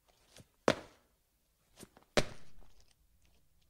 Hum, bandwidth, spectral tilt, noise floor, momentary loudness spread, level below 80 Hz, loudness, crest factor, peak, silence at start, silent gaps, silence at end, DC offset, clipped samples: none; 16 kHz; -4 dB/octave; -76 dBFS; 24 LU; -58 dBFS; -36 LUFS; 30 dB; -12 dBFS; 0.35 s; none; 0.95 s; under 0.1%; under 0.1%